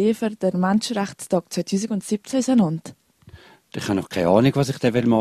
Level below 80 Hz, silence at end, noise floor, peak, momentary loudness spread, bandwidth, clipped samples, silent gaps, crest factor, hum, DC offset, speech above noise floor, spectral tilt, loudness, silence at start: -56 dBFS; 0 s; -48 dBFS; -2 dBFS; 8 LU; 14 kHz; under 0.1%; none; 18 dB; none; under 0.1%; 27 dB; -6 dB/octave; -22 LUFS; 0 s